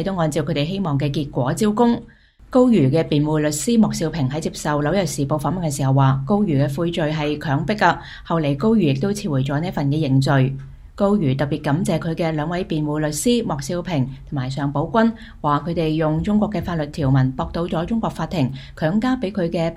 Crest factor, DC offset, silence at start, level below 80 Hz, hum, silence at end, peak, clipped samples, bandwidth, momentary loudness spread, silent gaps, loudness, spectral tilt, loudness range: 18 dB; under 0.1%; 0 s; -42 dBFS; none; 0 s; -2 dBFS; under 0.1%; 15.5 kHz; 6 LU; none; -20 LUFS; -6.5 dB/octave; 3 LU